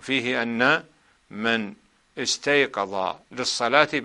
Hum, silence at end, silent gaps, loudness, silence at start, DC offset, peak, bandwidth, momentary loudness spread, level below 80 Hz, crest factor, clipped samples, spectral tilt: none; 0 s; none; -23 LUFS; 0 s; under 0.1%; 0 dBFS; 11.5 kHz; 10 LU; -66 dBFS; 24 dB; under 0.1%; -3 dB/octave